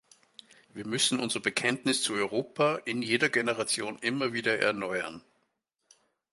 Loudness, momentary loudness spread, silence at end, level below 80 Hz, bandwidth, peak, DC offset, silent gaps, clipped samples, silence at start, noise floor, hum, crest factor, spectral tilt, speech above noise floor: -28 LUFS; 7 LU; 1.1 s; -74 dBFS; 12 kHz; -10 dBFS; under 0.1%; none; under 0.1%; 0.75 s; -78 dBFS; none; 20 dB; -3 dB/octave; 49 dB